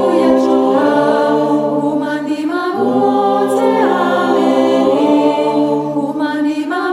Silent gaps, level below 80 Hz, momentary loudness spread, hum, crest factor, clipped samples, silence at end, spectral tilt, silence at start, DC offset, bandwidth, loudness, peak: none; -62 dBFS; 6 LU; none; 12 dB; under 0.1%; 0 s; -6 dB/octave; 0 s; under 0.1%; 13 kHz; -14 LUFS; -2 dBFS